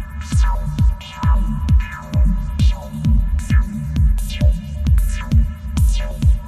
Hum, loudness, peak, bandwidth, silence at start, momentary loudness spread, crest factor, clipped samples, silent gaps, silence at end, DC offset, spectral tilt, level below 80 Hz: none; -19 LUFS; -4 dBFS; 13.5 kHz; 0 s; 4 LU; 12 dB; under 0.1%; none; 0 s; under 0.1%; -6.5 dB/octave; -18 dBFS